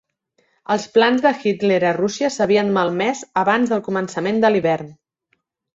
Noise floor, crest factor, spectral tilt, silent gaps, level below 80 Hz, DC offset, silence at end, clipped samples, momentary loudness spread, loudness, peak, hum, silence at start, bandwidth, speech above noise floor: -69 dBFS; 18 dB; -5 dB/octave; none; -62 dBFS; under 0.1%; 0.8 s; under 0.1%; 7 LU; -18 LUFS; -2 dBFS; none; 0.7 s; 7.8 kHz; 51 dB